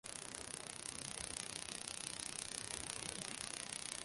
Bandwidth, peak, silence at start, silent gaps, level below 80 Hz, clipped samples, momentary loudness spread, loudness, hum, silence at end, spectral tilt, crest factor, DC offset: 12 kHz; -18 dBFS; 0.05 s; none; -68 dBFS; under 0.1%; 3 LU; -45 LUFS; none; 0 s; -1 dB/octave; 28 dB; under 0.1%